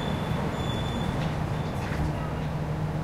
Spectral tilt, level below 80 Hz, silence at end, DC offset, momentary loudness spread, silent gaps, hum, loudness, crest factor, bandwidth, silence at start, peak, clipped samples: -6.5 dB/octave; -40 dBFS; 0 s; under 0.1%; 2 LU; none; none; -30 LUFS; 14 dB; 14.5 kHz; 0 s; -14 dBFS; under 0.1%